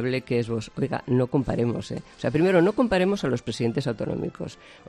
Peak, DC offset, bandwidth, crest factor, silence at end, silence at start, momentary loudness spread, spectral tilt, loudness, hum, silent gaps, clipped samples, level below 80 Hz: -6 dBFS; under 0.1%; 12 kHz; 18 dB; 0.1 s; 0 s; 11 LU; -7 dB/octave; -25 LUFS; none; none; under 0.1%; -50 dBFS